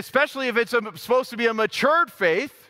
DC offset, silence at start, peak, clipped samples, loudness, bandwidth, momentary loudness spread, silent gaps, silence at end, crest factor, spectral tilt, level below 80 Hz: under 0.1%; 0 s; -4 dBFS; under 0.1%; -22 LUFS; 16 kHz; 4 LU; none; 0.2 s; 18 dB; -3.5 dB/octave; -68 dBFS